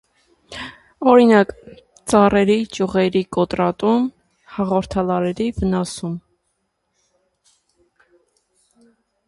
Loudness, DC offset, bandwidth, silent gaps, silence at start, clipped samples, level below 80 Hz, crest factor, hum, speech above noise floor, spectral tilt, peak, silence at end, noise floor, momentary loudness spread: -18 LUFS; under 0.1%; 11.5 kHz; none; 0.5 s; under 0.1%; -46 dBFS; 20 dB; none; 54 dB; -6 dB/octave; 0 dBFS; 3.1 s; -71 dBFS; 19 LU